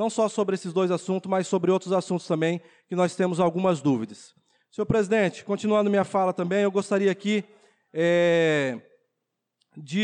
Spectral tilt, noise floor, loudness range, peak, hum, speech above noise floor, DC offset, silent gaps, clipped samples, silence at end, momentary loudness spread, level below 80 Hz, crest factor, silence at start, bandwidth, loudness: -6 dB/octave; -81 dBFS; 2 LU; -12 dBFS; none; 57 dB; under 0.1%; none; under 0.1%; 0 s; 8 LU; -62 dBFS; 12 dB; 0 s; 10.5 kHz; -25 LUFS